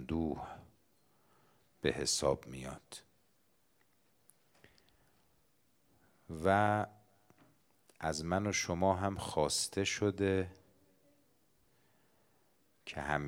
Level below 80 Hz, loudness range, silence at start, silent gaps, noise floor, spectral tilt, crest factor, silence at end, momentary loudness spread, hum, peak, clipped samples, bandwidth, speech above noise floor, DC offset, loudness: -62 dBFS; 6 LU; 0 s; none; -75 dBFS; -4 dB/octave; 24 dB; 0 s; 17 LU; none; -14 dBFS; under 0.1%; over 20 kHz; 40 dB; under 0.1%; -35 LUFS